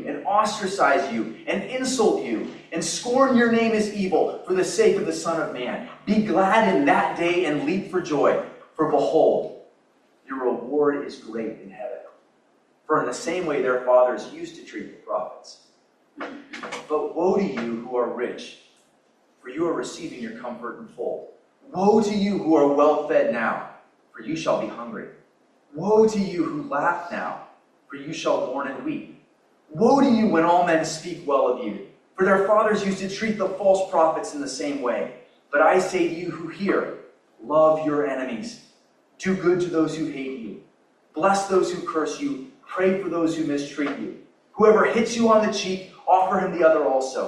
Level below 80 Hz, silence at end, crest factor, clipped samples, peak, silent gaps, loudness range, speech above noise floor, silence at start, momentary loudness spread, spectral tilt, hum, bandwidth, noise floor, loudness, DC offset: -66 dBFS; 0 s; 18 dB; under 0.1%; -4 dBFS; none; 6 LU; 40 dB; 0 s; 17 LU; -5 dB/octave; none; 12 kHz; -62 dBFS; -22 LUFS; under 0.1%